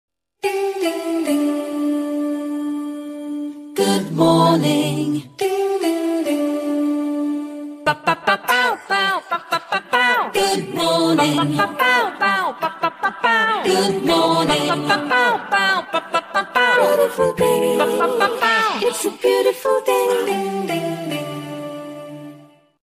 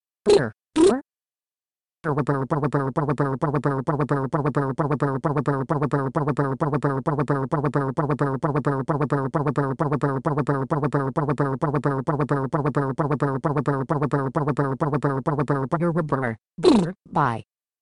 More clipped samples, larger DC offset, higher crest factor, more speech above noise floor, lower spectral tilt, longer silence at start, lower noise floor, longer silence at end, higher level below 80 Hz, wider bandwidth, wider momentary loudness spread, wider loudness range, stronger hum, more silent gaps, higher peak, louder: neither; neither; about the same, 16 dB vs 20 dB; second, 29 dB vs over 67 dB; second, -4 dB/octave vs -7.5 dB/octave; first, 0.45 s vs 0.25 s; second, -46 dBFS vs under -90 dBFS; about the same, 0.4 s vs 0.4 s; second, -58 dBFS vs -52 dBFS; first, 15.5 kHz vs 11 kHz; first, 10 LU vs 5 LU; first, 4 LU vs 1 LU; neither; neither; about the same, -4 dBFS vs -4 dBFS; first, -18 LUFS vs -23 LUFS